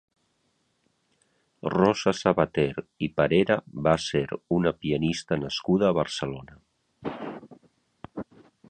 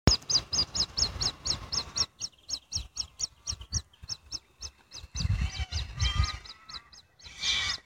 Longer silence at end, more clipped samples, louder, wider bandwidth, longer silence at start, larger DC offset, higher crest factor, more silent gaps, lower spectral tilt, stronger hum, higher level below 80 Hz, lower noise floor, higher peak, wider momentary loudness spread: first, 0.45 s vs 0.05 s; neither; first, -26 LUFS vs -31 LUFS; second, 9.2 kHz vs 16.5 kHz; first, 1.65 s vs 0.05 s; neither; second, 22 dB vs 30 dB; neither; first, -6 dB/octave vs -2.5 dB/octave; neither; second, -54 dBFS vs -40 dBFS; first, -72 dBFS vs -53 dBFS; about the same, -4 dBFS vs -2 dBFS; about the same, 17 LU vs 17 LU